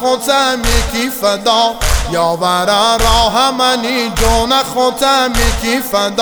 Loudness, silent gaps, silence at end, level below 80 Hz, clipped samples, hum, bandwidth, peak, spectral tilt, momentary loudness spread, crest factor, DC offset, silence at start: -12 LUFS; none; 0 s; -22 dBFS; under 0.1%; none; over 20 kHz; 0 dBFS; -3 dB/octave; 4 LU; 12 dB; under 0.1%; 0 s